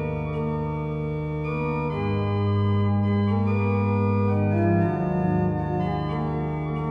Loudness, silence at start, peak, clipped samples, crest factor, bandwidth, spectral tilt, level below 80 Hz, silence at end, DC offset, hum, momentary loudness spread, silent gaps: -25 LUFS; 0 s; -10 dBFS; under 0.1%; 14 dB; 5.2 kHz; -10.5 dB/octave; -44 dBFS; 0 s; under 0.1%; 50 Hz at -50 dBFS; 6 LU; none